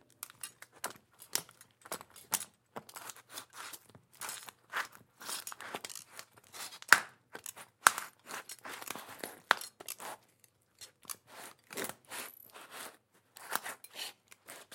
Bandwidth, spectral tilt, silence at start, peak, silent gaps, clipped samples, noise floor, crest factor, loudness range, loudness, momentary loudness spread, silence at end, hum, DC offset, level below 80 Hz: 17 kHz; 0.5 dB/octave; 0.2 s; 0 dBFS; none; under 0.1%; -69 dBFS; 40 dB; 11 LU; -37 LUFS; 23 LU; 0 s; none; under 0.1%; -88 dBFS